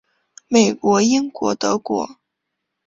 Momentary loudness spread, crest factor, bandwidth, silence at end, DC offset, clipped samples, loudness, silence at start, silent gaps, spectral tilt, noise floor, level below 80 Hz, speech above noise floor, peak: 9 LU; 18 dB; 7.8 kHz; 0.75 s; under 0.1%; under 0.1%; -18 LUFS; 0.5 s; none; -4 dB/octave; -78 dBFS; -60 dBFS; 61 dB; -2 dBFS